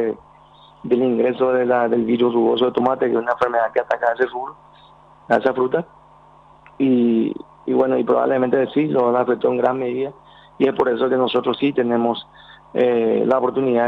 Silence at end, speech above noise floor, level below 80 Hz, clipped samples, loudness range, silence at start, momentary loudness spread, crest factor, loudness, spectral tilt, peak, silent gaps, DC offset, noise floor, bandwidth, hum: 0 s; 30 dB; -60 dBFS; under 0.1%; 4 LU; 0 s; 8 LU; 16 dB; -19 LUFS; -8 dB/octave; -4 dBFS; none; under 0.1%; -48 dBFS; 5.4 kHz; none